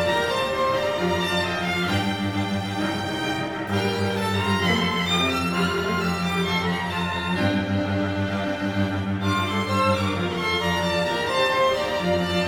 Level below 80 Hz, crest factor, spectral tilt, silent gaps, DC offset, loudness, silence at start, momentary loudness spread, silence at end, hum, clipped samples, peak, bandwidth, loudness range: -50 dBFS; 16 dB; -5 dB/octave; none; under 0.1%; -23 LUFS; 0 s; 5 LU; 0 s; none; under 0.1%; -8 dBFS; 20 kHz; 2 LU